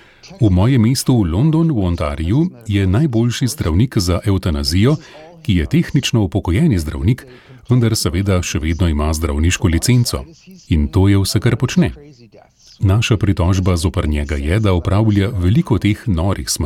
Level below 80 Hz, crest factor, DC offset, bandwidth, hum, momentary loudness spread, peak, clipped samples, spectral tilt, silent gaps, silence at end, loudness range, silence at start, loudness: -28 dBFS; 12 dB; under 0.1%; 16 kHz; none; 5 LU; -2 dBFS; under 0.1%; -6 dB/octave; none; 0 s; 2 LU; 0.25 s; -16 LUFS